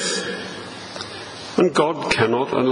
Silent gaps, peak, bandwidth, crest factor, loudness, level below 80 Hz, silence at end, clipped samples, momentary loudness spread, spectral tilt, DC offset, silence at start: none; -2 dBFS; 11 kHz; 20 dB; -21 LUFS; -54 dBFS; 0 s; under 0.1%; 14 LU; -4 dB/octave; under 0.1%; 0 s